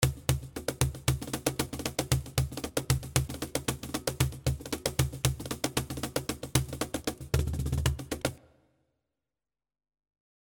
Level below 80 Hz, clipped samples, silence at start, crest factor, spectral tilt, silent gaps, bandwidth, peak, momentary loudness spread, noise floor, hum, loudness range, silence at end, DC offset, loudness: -40 dBFS; under 0.1%; 0 s; 32 dB; -4.5 dB/octave; none; over 20 kHz; 0 dBFS; 5 LU; under -90 dBFS; none; 4 LU; 2.1 s; under 0.1%; -32 LUFS